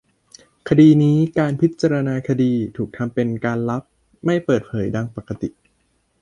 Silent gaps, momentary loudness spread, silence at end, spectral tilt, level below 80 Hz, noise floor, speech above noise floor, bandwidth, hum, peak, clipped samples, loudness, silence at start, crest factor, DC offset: none; 16 LU; 0.7 s; -8.5 dB/octave; -52 dBFS; -65 dBFS; 47 dB; 9.4 kHz; none; -2 dBFS; under 0.1%; -19 LUFS; 0.65 s; 16 dB; under 0.1%